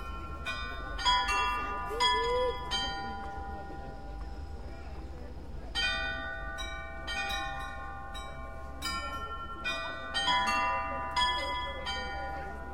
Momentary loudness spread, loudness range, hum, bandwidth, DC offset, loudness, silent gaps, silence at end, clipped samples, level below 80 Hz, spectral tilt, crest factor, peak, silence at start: 17 LU; 7 LU; none; 16.5 kHz; 0.4%; -33 LUFS; none; 0 s; under 0.1%; -44 dBFS; -3 dB/octave; 20 dB; -14 dBFS; 0 s